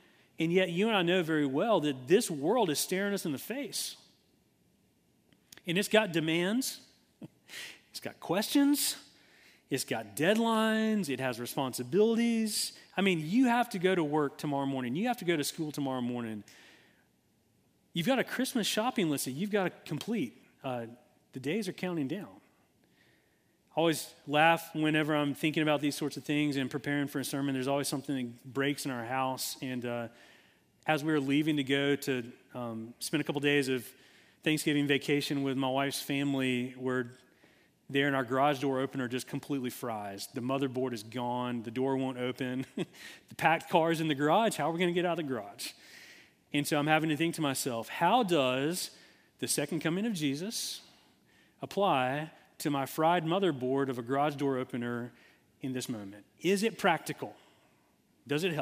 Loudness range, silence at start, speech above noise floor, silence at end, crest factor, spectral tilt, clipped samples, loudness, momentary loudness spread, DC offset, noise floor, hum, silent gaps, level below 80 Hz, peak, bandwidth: 5 LU; 0.4 s; 39 dB; 0 s; 24 dB; -4.5 dB/octave; under 0.1%; -31 LUFS; 12 LU; under 0.1%; -71 dBFS; none; none; -78 dBFS; -8 dBFS; 16 kHz